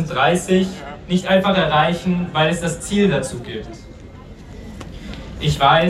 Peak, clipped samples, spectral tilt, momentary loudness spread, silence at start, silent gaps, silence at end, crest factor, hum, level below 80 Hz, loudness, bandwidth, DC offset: -2 dBFS; under 0.1%; -5 dB/octave; 22 LU; 0 s; none; 0 s; 18 dB; none; -38 dBFS; -18 LUFS; 13.5 kHz; under 0.1%